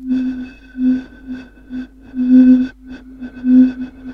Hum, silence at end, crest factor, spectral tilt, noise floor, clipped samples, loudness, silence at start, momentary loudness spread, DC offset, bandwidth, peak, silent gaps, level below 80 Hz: none; 0 s; 14 dB; -8 dB/octave; -35 dBFS; under 0.1%; -14 LUFS; 0 s; 22 LU; under 0.1%; 4.8 kHz; -2 dBFS; none; -44 dBFS